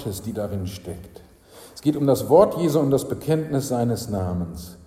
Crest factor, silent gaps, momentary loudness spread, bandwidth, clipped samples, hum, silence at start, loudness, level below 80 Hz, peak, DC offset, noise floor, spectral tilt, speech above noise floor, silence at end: 20 dB; none; 17 LU; 16 kHz; under 0.1%; none; 0 s; -22 LUFS; -48 dBFS; -2 dBFS; under 0.1%; -47 dBFS; -7 dB/octave; 25 dB; 0.1 s